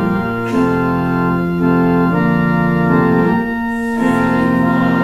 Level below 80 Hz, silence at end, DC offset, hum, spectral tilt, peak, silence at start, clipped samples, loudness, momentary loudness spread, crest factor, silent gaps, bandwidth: -38 dBFS; 0 s; under 0.1%; none; -8.5 dB/octave; -2 dBFS; 0 s; under 0.1%; -15 LUFS; 4 LU; 12 dB; none; 13 kHz